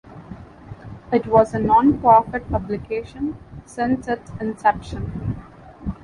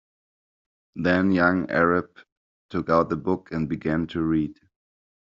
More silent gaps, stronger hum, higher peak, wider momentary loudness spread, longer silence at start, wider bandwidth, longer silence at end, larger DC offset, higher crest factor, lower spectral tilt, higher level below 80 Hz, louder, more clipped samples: second, none vs 2.32-2.69 s; neither; about the same, -2 dBFS vs -4 dBFS; first, 24 LU vs 10 LU; second, 0.05 s vs 0.95 s; first, 11 kHz vs 7.4 kHz; second, 0.1 s vs 0.75 s; neither; about the same, 20 dB vs 22 dB; first, -8 dB/octave vs -6 dB/octave; first, -40 dBFS vs -56 dBFS; first, -20 LUFS vs -24 LUFS; neither